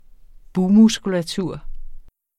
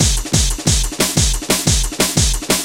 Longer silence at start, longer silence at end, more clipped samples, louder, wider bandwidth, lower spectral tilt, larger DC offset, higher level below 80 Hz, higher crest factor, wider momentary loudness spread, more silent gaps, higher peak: first, 0.55 s vs 0 s; first, 0.35 s vs 0 s; neither; second, -18 LUFS vs -15 LUFS; second, 12.5 kHz vs 17 kHz; first, -6 dB/octave vs -3 dB/octave; neither; second, -38 dBFS vs -22 dBFS; about the same, 16 dB vs 16 dB; first, 15 LU vs 2 LU; neither; second, -4 dBFS vs 0 dBFS